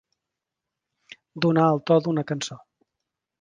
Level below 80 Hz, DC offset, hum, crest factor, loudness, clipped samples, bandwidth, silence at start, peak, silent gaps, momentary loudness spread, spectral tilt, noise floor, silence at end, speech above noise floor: -68 dBFS; under 0.1%; none; 20 dB; -23 LUFS; under 0.1%; 9.8 kHz; 1.35 s; -6 dBFS; none; 13 LU; -6.5 dB/octave; -86 dBFS; 0.85 s; 64 dB